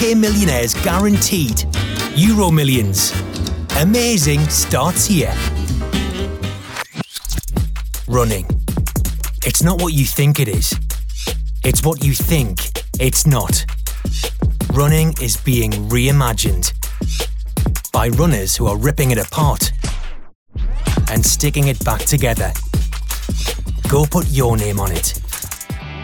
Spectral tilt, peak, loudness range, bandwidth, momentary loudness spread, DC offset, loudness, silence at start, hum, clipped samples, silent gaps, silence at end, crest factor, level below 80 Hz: -4.5 dB/octave; -2 dBFS; 4 LU; over 20 kHz; 10 LU; under 0.1%; -17 LUFS; 0 s; none; under 0.1%; 20.35-20.46 s; 0 s; 14 dB; -22 dBFS